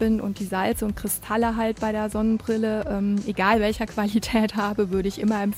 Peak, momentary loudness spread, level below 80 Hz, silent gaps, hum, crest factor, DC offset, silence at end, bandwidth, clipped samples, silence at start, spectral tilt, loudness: -6 dBFS; 4 LU; -42 dBFS; none; none; 18 dB; under 0.1%; 0 s; 16 kHz; under 0.1%; 0 s; -5.5 dB/octave; -24 LUFS